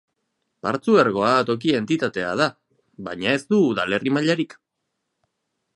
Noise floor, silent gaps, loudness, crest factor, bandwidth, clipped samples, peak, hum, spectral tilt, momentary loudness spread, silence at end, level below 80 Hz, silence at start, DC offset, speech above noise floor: -78 dBFS; none; -21 LUFS; 18 dB; 11.5 kHz; under 0.1%; -4 dBFS; none; -5.5 dB/octave; 10 LU; 1.3 s; -62 dBFS; 0.65 s; under 0.1%; 58 dB